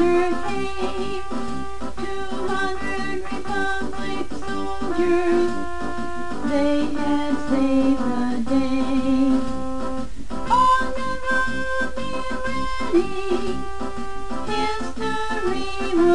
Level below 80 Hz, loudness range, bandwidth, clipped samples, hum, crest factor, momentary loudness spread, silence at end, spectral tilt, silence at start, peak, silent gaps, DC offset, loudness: -38 dBFS; 5 LU; 10 kHz; under 0.1%; none; 16 dB; 11 LU; 0 s; -5 dB/octave; 0 s; -8 dBFS; none; 6%; -24 LUFS